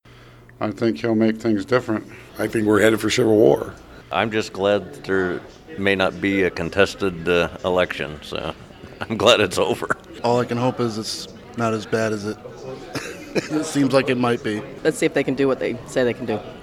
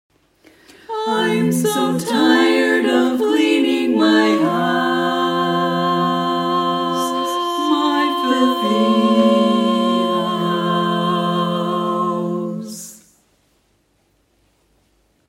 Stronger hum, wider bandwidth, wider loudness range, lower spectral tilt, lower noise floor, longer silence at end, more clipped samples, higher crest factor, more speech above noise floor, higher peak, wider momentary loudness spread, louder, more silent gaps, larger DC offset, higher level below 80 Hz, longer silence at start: neither; about the same, 16.5 kHz vs 16.5 kHz; second, 4 LU vs 7 LU; about the same, -5 dB/octave vs -5 dB/octave; second, -46 dBFS vs -62 dBFS; second, 0 s vs 2.35 s; neither; first, 20 dB vs 14 dB; second, 25 dB vs 46 dB; first, 0 dBFS vs -4 dBFS; first, 14 LU vs 6 LU; second, -21 LUFS vs -17 LUFS; neither; neither; first, -50 dBFS vs -66 dBFS; second, 0.25 s vs 0.9 s